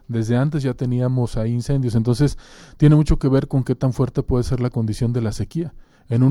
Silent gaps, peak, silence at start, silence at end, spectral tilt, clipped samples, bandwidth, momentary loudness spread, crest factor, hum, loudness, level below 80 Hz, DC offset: none; -2 dBFS; 0.1 s; 0 s; -8 dB/octave; under 0.1%; 12 kHz; 8 LU; 16 dB; none; -20 LUFS; -32 dBFS; under 0.1%